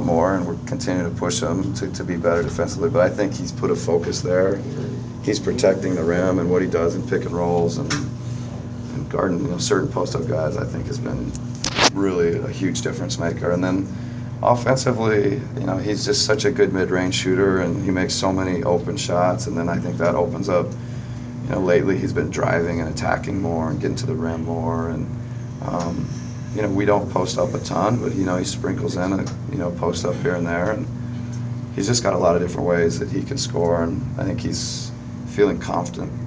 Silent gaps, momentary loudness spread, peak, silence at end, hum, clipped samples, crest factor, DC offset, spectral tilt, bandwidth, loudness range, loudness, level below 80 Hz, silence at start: none; 10 LU; 0 dBFS; 0 s; none; under 0.1%; 20 dB; under 0.1%; -5.5 dB/octave; 8 kHz; 4 LU; -22 LUFS; -40 dBFS; 0 s